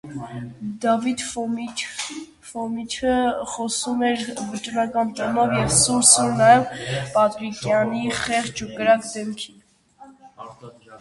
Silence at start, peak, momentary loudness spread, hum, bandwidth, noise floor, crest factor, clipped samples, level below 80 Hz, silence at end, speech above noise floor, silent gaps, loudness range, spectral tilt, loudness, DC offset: 0.05 s; 0 dBFS; 18 LU; none; 11.5 kHz; -50 dBFS; 22 dB; under 0.1%; -52 dBFS; 0 s; 28 dB; none; 7 LU; -3 dB/octave; -21 LUFS; under 0.1%